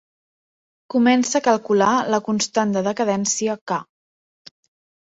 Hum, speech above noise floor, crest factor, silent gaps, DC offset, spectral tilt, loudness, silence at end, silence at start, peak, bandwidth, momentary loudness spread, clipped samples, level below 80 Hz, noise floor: none; over 71 dB; 18 dB; 3.61-3.67 s; under 0.1%; -4 dB/octave; -20 LUFS; 1.2 s; 0.95 s; -4 dBFS; 8 kHz; 8 LU; under 0.1%; -66 dBFS; under -90 dBFS